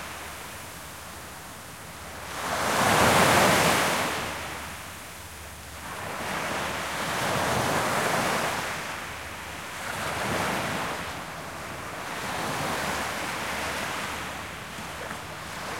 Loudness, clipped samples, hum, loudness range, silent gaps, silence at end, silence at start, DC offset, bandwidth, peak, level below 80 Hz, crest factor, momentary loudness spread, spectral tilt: -27 LUFS; under 0.1%; none; 8 LU; none; 0 s; 0 s; 0.1%; 16.5 kHz; -8 dBFS; -52 dBFS; 22 dB; 18 LU; -3 dB/octave